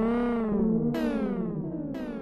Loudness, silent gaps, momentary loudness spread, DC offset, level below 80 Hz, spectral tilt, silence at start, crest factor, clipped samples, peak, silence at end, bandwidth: -29 LUFS; none; 8 LU; under 0.1%; -46 dBFS; -9 dB/octave; 0 s; 12 dB; under 0.1%; -14 dBFS; 0 s; 12.5 kHz